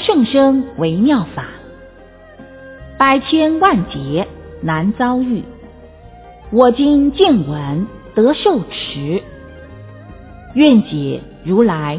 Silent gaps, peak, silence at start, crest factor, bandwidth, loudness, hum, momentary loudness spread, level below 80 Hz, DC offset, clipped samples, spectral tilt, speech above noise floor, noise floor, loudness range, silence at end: none; 0 dBFS; 0 s; 16 dB; 4 kHz; -15 LUFS; none; 17 LU; -40 dBFS; under 0.1%; under 0.1%; -10.5 dB/octave; 27 dB; -40 dBFS; 3 LU; 0 s